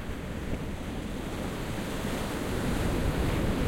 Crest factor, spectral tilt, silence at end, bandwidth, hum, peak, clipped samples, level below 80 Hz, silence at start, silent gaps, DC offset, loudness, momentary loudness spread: 14 dB; -6 dB/octave; 0 s; 16.5 kHz; none; -18 dBFS; under 0.1%; -36 dBFS; 0 s; none; under 0.1%; -33 LUFS; 7 LU